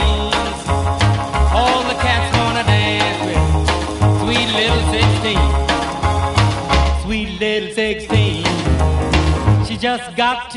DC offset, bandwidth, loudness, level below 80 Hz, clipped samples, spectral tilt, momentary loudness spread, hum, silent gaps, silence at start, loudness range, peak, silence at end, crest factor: under 0.1%; 11.5 kHz; -16 LUFS; -22 dBFS; under 0.1%; -5 dB/octave; 4 LU; none; none; 0 s; 2 LU; 0 dBFS; 0 s; 16 dB